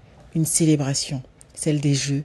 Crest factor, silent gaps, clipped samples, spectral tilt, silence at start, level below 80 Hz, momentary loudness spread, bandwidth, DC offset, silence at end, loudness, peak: 16 dB; none; under 0.1%; -4.5 dB/octave; 0.35 s; -52 dBFS; 12 LU; 12.5 kHz; under 0.1%; 0 s; -22 LUFS; -6 dBFS